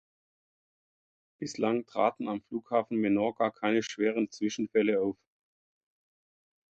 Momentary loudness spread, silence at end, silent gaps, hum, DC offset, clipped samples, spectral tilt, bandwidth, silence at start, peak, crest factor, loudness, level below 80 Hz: 9 LU; 1.6 s; none; none; under 0.1%; under 0.1%; -5.5 dB/octave; 8.2 kHz; 1.4 s; -12 dBFS; 20 dB; -30 LUFS; -74 dBFS